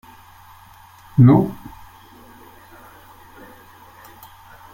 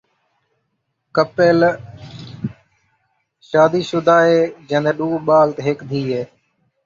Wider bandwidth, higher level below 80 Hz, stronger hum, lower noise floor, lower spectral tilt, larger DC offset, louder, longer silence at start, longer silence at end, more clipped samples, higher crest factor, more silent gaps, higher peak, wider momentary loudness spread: first, 16.5 kHz vs 7.4 kHz; first, -50 dBFS vs -58 dBFS; neither; second, -46 dBFS vs -72 dBFS; first, -10 dB/octave vs -6.5 dB/octave; neither; about the same, -15 LUFS vs -16 LUFS; about the same, 1.15 s vs 1.15 s; first, 3.2 s vs 0.6 s; neither; about the same, 20 dB vs 16 dB; neither; about the same, -2 dBFS vs -2 dBFS; first, 30 LU vs 17 LU